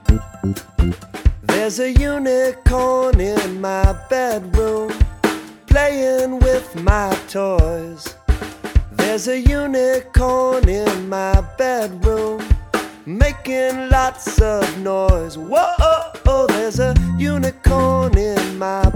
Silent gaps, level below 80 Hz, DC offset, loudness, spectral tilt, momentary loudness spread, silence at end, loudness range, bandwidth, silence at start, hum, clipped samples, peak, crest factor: none; -20 dBFS; under 0.1%; -18 LUFS; -6 dB/octave; 6 LU; 0 s; 2 LU; 17.5 kHz; 0.05 s; none; under 0.1%; 0 dBFS; 16 dB